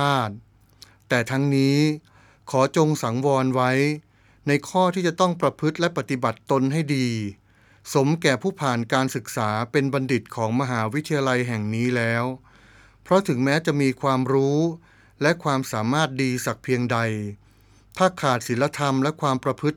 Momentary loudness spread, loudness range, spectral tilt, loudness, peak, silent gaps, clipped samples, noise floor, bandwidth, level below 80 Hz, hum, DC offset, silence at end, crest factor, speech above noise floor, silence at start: 6 LU; 2 LU; -6 dB/octave; -23 LUFS; -2 dBFS; none; under 0.1%; -54 dBFS; 18 kHz; -62 dBFS; none; under 0.1%; 0 s; 20 dB; 32 dB; 0 s